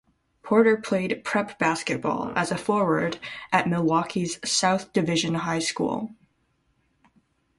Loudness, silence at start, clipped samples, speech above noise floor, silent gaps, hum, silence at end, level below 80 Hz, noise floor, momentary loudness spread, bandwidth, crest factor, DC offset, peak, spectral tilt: -24 LUFS; 0.45 s; under 0.1%; 45 dB; none; none; 1.45 s; -62 dBFS; -69 dBFS; 7 LU; 11.5 kHz; 20 dB; under 0.1%; -6 dBFS; -4.5 dB/octave